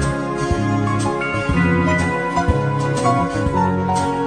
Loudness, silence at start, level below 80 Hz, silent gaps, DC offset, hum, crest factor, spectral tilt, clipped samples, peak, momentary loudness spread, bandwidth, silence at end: -18 LUFS; 0 s; -32 dBFS; none; under 0.1%; none; 14 dB; -6.5 dB/octave; under 0.1%; -4 dBFS; 3 LU; 10 kHz; 0 s